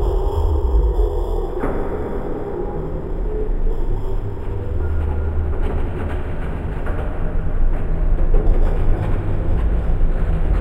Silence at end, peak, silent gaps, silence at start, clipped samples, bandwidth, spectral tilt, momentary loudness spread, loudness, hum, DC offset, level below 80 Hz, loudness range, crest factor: 0 s; -2 dBFS; none; 0 s; under 0.1%; 3.6 kHz; -9.5 dB/octave; 6 LU; -23 LUFS; none; under 0.1%; -18 dBFS; 3 LU; 14 dB